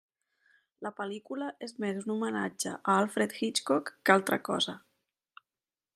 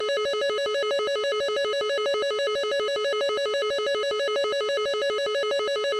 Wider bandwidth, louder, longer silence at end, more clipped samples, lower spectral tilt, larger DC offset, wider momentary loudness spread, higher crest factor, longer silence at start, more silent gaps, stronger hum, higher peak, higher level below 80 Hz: first, 15.5 kHz vs 12.5 kHz; second, -31 LUFS vs -25 LUFS; first, 1.15 s vs 0 s; neither; first, -3.5 dB/octave vs -0.5 dB/octave; neither; first, 13 LU vs 0 LU; first, 26 dB vs 8 dB; first, 0.8 s vs 0 s; neither; neither; first, -6 dBFS vs -16 dBFS; second, -82 dBFS vs -68 dBFS